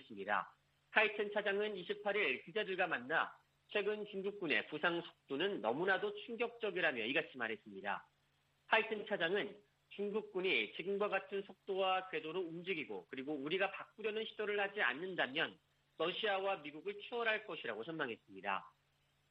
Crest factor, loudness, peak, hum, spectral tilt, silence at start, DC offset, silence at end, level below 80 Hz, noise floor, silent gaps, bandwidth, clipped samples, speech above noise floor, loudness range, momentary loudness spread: 24 dB; -39 LUFS; -16 dBFS; none; -6 dB/octave; 0 s; under 0.1%; 0.6 s; -86 dBFS; -78 dBFS; none; 5.6 kHz; under 0.1%; 38 dB; 3 LU; 9 LU